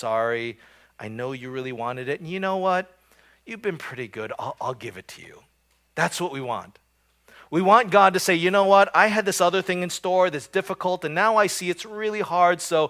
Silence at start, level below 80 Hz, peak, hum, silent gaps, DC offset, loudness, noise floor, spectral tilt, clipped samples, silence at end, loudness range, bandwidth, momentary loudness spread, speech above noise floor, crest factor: 0 s; -68 dBFS; -2 dBFS; none; none; under 0.1%; -22 LUFS; -61 dBFS; -4 dB/octave; under 0.1%; 0 s; 12 LU; 16 kHz; 16 LU; 38 dB; 22 dB